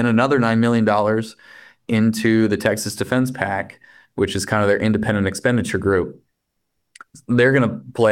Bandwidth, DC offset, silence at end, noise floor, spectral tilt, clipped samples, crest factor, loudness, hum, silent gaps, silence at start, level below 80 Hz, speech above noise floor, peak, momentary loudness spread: 15.5 kHz; under 0.1%; 0 s; -75 dBFS; -6 dB/octave; under 0.1%; 16 dB; -19 LUFS; none; none; 0 s; -54 dBFS; 56 dB; -2 dBFS; 8 LU